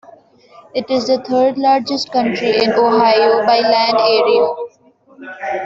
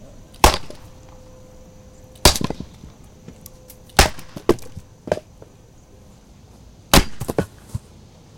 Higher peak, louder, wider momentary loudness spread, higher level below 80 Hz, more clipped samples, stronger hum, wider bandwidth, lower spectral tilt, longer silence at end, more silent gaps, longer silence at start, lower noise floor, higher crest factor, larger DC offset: about the same, -2 dBFS vs 0 dBFS; first, -14 LUFS vs -19 LUFS; second, 13 LU vs 25 LU; second, -60 dBFS vs -30 dBFS; neither; neither; second, 7.6 kHz vs 17 kHz; about the same, -4.5 dB/octave vs -3.5 dB/octave; second, 0 s vs 0.6 s; neither; first, 0.75 s vs 0 s; about the same, -49 dBFS vs -47 dBFS; second, 14 dB vs 24 dB; neither